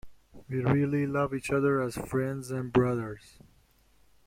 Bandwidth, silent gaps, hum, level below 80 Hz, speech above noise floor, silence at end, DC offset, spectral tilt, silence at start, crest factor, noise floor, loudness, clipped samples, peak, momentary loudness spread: 16.5 kHz; none; none; -56 dBFS; 36 dB; 1.1 s; under 0.1%; -7.5 dB/octave; 0.05 s; 20 dB; -64 dBFS; -29 LUFS; under 0.1%; -10 dBFS; 8 LU